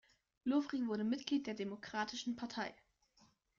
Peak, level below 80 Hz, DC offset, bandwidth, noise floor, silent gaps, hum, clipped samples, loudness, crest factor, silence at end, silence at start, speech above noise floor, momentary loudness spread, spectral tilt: -22 dBFS; -78 dBFS; under 0.1%; 7.4 kHz; -73 dBFS; none; none; under 0.1%; -40 LUFS; 18 dB; 0.85 s; 0.45 s; 33 dB; 8 LU; -4.5 dB/octave